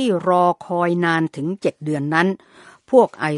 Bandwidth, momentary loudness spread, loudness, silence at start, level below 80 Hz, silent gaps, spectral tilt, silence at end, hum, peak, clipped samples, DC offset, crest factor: 11.5 kHz; 8 LU; -19 LUFS; 0 s; -66 dBFS; none; -7 dB/octave; 0 s; none; 0 dBFS; under 0.1%; under 0.1%; 18 dB